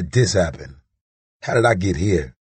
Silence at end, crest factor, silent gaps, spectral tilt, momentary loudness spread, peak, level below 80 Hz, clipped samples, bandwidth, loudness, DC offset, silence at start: 0.15 s; 18 dB; 1.01-1.40 s; -5.5 dB/octave; 12 LU; -2 dBFS; -38 dBFS; under 0.1%; 8.8 kHz; -19 LUFS; under 0.1%; 0 s